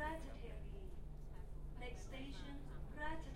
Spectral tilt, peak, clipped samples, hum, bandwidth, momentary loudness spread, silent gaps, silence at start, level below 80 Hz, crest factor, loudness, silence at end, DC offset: -5.5 dB/octave; -32 dBFS; under 0.1%; none; 13 kHz; 8 LU; none; 0 s; -50 dBFS; 16 dB; -52 LUFS; 0 s; under 0.1%